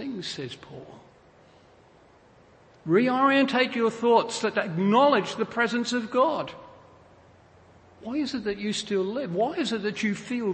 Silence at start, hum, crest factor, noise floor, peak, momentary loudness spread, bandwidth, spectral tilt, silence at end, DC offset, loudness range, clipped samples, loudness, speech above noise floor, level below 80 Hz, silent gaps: 0 s; none; 18 dB; -56 dBFS; -8 dBFS; 17 LU; 8.8 kHz; -5 dB/octave; 0 s; under 0.1%; 7 LU; under 0.1%; -25 LUFS; 31 dB; -66 dBFS; none